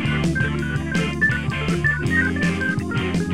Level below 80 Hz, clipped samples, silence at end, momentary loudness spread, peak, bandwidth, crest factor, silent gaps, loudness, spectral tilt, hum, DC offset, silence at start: -36 dBFS; under 0.1%; 0 s; 4 LU; -6 dBFS; 12.5 kHz; 14 dB; none; -21 LUFS; -6 dB/octave; none; 0.7%; 0 s